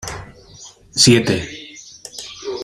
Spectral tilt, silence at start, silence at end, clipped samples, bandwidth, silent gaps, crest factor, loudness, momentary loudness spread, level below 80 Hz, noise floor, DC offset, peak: -3.5 dB/octave; 0 s; 0 s; under 0.1%; 16 kHz; none; 20 dB; -15 LUFS; 23 LU; -46 dBFS; -42 dBFS; under 0.1%; 0 dBFS